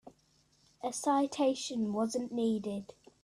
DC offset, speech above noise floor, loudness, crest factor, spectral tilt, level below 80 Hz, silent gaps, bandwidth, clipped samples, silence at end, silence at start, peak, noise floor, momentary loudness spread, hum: under 0.1%; 37 dB; -33 LUFS; 16 dB; -4.5 dB/octave; -74 dBFS; none; 13.5 kHz; under 0.1%; 0.4 s; 0.05 s; -18 dBFS; -70 dBFS; 11 LU; none